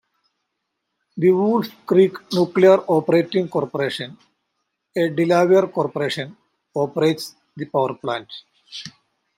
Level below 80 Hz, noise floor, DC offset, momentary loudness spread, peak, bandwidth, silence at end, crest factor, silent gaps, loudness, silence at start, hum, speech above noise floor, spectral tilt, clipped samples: -68 dBFS; -77 dBFS; under 0.1%; 20 LU; -2 dBFS; 15.5 kHz; 0.5 s; 18 dB; none; -19 LUFS; 1.15 s; none; 58 dB; -6.5 dB/octave; under 0.1%